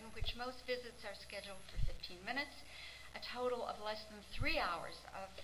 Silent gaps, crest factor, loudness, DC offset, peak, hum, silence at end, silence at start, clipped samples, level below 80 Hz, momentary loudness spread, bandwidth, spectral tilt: none; 20 dB; -44 LUFS; 0.1%; -22 dBFS; none; 0 s; 0 s; under 0.1%; -52 dBFS; 12 LU; 16 kHz; -4 dB/octave